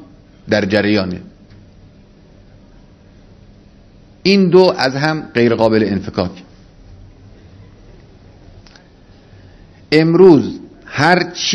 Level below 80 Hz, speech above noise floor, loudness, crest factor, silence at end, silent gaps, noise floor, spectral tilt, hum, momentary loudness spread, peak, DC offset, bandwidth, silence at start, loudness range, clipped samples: -46 dBFS; 32 dB; -13 LUFS; 16 dB; 0 s; none; -44 dBFS; -5.5 dB/octave; none; 16 LU; 0 dBFS; under 0.1%; 10 kHz; 0 s; 10 LU; 0.2%